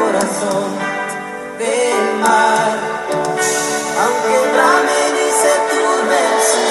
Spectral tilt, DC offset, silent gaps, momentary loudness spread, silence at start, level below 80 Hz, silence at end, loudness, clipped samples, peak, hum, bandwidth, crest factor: -2 dB/octave; under 0.1%; none; 8 LU; 0 s; -60 dBFS; 0 s; -15 LUFS; under 0.1%; 0 dBFS; none; 14 kHz; 14 dB